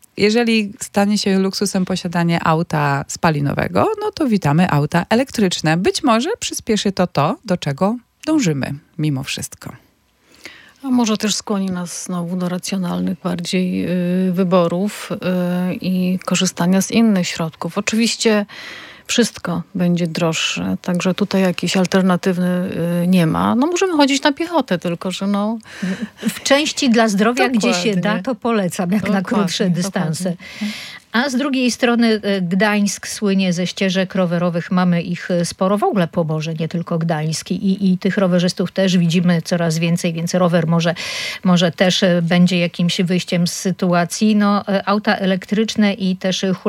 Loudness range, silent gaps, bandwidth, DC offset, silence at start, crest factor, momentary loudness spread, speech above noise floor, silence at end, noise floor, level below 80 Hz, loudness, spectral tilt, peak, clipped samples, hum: 4 LU; none; 15.5 kHz; under 0.1%; 0.15 s; 16 dB; 7 LU; 37 dB; 0 s; -54 dBFS; -56 dBFS; -18 LUFS; -5 dB/octave; -2 dBFS; under 0.1%; none